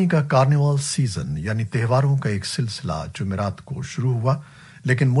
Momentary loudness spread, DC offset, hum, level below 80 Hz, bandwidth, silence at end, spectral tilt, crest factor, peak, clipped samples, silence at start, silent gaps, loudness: 10 LU; under 0.1%; none; -48 dBFS; 11.5 kHz; 0 s; -6 dB/octave; 14 dB; -6 dBFS; under 0.1%; 0 s; none; -22 LUFS